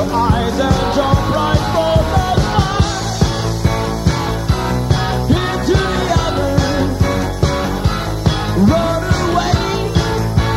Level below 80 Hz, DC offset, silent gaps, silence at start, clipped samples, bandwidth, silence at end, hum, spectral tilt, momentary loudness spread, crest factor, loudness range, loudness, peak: -24 dBFS; under 0.1%; none; 0 s; under 0.1%; 15.5 kHz; 0 s; none; -6 dB/octave; 3 LU; 14 dB; 1 LU; -16 LUFS; 0 dBFS